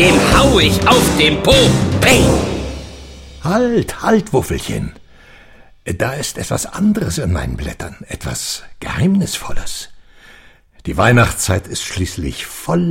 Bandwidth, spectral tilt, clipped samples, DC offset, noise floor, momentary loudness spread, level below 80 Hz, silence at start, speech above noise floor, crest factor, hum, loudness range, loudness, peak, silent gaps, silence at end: 16.5 kHz; -4.5 dB/octave; under 0.1%; under 0.1%; -44 dBFS; 17 LU; -28 dBFS; 0 s; 29 dB; 16 dB; none; 8 LU; -15 LUFS; 0 dBFS; none; 0 s